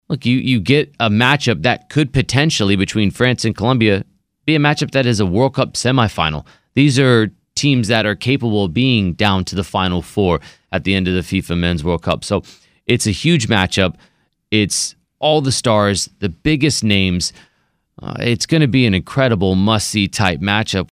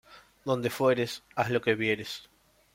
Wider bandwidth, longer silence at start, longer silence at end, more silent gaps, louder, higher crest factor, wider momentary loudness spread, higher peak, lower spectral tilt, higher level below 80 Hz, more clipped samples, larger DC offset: about the same, 15.5 kHz vs 16.5 kHz; about the same, 0.1 s vs 0.1 s; second, 0.05 s vs 0.5 s; neither; first, -16 LUFS vs -29 LUFS; about the same, 16 dB vs 18 dB; second, 6 LU vs 13 LU; first, 0 dBFS vs -12 dBFS; about the same, -5 dB/octave vs -5 dB/octave; first, -40 dBFS vs -66 dBFS; neither; neither